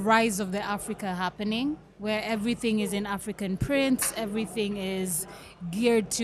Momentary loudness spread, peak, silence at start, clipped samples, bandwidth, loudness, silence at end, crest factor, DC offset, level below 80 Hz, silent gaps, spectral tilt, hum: 8 LU; -8 dBFS; 0 s; under 0.1%; 15 kHz; -28 LUFS; 0 s; 20 dB; under 0.1%; -52 dBFS; none; -4 dB/octave; none